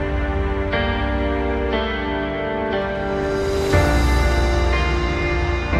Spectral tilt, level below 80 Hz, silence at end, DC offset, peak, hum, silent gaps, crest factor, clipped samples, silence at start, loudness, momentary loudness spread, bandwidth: -6 dB/octave; -24 dBFS; 0 s; under 0.1%; -4 dBFS; none; none; 16 dB; under 0.1%; 0 s; -21 LUFS; 5 LU; 13 kHz